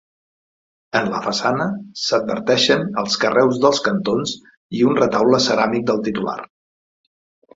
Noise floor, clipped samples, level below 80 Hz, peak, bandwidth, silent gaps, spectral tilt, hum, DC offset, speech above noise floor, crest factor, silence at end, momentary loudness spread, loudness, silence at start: under -90 dBFS; under 0.1%; -58 dBFS; -2 dBFS; 7.8 kHz; 4.57-4.69 s; -4.5 dB/octave; none; under 0.1%; over 72 dB; 18 dB; 1.1 s; 9 LU; -18 LUFS; 0.95 s